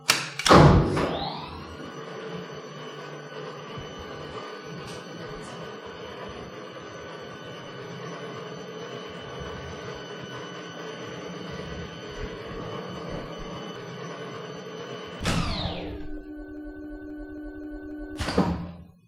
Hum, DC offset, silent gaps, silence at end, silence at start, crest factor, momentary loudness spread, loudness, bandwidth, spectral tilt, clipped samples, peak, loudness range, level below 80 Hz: none; under 0.1%; none; 0.15 s; 0 s; 26 dB; 13 LU; -30 LUFS; 16 kHz; -5 dB/octave; under 0.1%; -4 dBFS; 6 LU; -42 dBFS